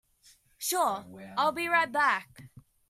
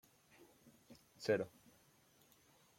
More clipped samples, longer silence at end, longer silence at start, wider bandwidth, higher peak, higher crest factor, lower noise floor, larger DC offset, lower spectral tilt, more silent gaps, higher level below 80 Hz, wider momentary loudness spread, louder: neither; second, 0.3 s vs 1.3 s; first, 0.6 s vs 0.4 s; about the same, 16 kHz vs 16.5 kHz; first, -12 dBFS vs -24 dBFS; second, 18 dB vs 24 dB; second, -62 dBFS vs -71 dBFS; neither; second, -2 dB/octave vs -5.5 dB/octave; neither; first, -72 dBFS vs -84 dBFS; second, 10 LU vs 27 LU; first, -28 LUFS vs -41 LUFS